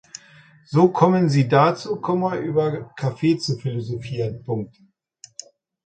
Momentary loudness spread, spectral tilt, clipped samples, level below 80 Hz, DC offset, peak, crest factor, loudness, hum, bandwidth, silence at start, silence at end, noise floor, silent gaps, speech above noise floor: 23 LU; -7 dB/octave; under 0.1%; -60 dBFS; under 0.1%; 0 dBFS; 20 dB; -21 LUFS; none; 9 kHz; 0.7 s; 1.2 s; -50 dBFS; none; 30 dB